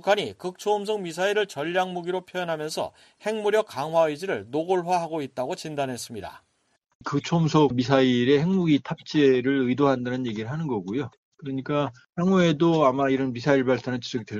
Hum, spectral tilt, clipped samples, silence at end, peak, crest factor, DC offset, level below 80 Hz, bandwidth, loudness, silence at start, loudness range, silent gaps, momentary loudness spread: none; -6 dB/octave; under 0.1%; 0 s; -4 dBFS; 20 dB; under 0.1%; -62 dBFS; 13.5 kHz; -25 LUFS; 0.05 s; 6 LU; 6.95-7.00 s, 11.17-11.32 s; 11 LU